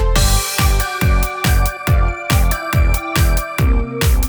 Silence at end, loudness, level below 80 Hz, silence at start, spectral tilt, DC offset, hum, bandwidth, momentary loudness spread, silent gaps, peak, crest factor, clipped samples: 0 s; -16 LUFS; -16 dBFS; 0 s; -4.5 dB/octave; under 0.1%; none; over 20 kHz; 2 LU; none; 0 dBFS; 14 dB; under 0.1%